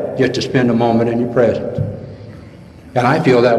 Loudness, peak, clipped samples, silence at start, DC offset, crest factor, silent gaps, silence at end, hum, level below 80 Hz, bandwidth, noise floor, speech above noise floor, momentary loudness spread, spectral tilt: -15 LUFS; 0 dBFS; under 0.1%; 0 s; under 0.1%; 14 dB; none; 0 s; none; -46 dBFS; 12 kHz; -37 dBFS; 24 dB; 19 LU; -7 dB/octave